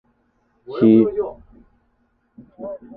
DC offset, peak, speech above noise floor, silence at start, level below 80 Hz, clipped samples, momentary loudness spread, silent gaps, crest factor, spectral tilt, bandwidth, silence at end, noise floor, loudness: under 0.1%; -2 dBFS; 48 dB; 0.7 s; -56 dBFS; under 0.1%; 20 LU; none; 18 dB; -12 dB/octave; 4.7 kHz; 0.2 s; -65 dBFS; -17 LUFS